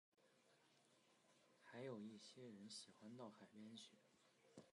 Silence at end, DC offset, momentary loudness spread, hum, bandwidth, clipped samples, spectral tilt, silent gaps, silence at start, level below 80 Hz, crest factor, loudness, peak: 0.05 s; under 0.1%; 9 LU; none; 11 kHz; under 0.1%; -4.5 dB/octave; none; 0.15 s; under -90 dBFS; 20 dB; -60 LUFS; -42 dBFS